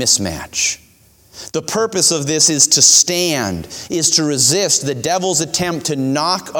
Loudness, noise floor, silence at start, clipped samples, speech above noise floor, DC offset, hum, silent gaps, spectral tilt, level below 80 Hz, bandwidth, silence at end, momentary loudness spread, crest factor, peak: -13 LUFS; -49 dBFS; 0 s; under 0.1%; 34 dB; under 0.1%; none; none; -2 dB/octave; -48 dBFS; over 20 kHz; 0 s; 14 LU; 16 dB; 0 dBFS